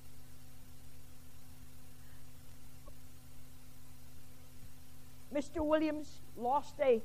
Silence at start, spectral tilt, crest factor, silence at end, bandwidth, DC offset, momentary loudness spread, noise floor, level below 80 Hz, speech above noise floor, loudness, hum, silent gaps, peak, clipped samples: 0 s; -5.5 dB/octave; 22 dB; 0 s; 15.5 kHz; 0.6%; 25 LU; -56 dBFS; -60 dBFS; 22 dB; -36 LUFS; none; none; -18 dBFS; under 0.1%